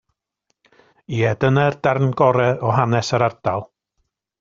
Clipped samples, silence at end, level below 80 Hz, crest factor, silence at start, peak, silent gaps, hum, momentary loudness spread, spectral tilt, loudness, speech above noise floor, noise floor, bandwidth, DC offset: under 0.1%; 0.75 s; -54 dBFS; 18 dB; 1.1 s; -2 dBFS; none; none; 8 LU; -6 dB/octave; -19 LUFS; 55 dB; -73 dBFS; 7.6 kHz; under 0.1%